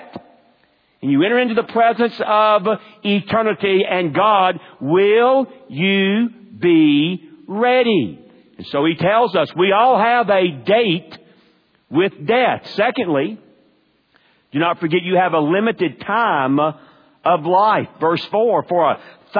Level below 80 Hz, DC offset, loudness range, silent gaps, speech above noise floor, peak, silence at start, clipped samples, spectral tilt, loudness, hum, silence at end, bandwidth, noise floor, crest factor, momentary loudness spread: -66 dBFS; under 0.1%; 4 LU; none; 43 dB; -2 dBFS; 0 s; under 0.1%; -8.5 dB/octave; -17 LUFS; none; 0 s; 5.2 kHz; -59 dBFS; 16 dB; 9 LU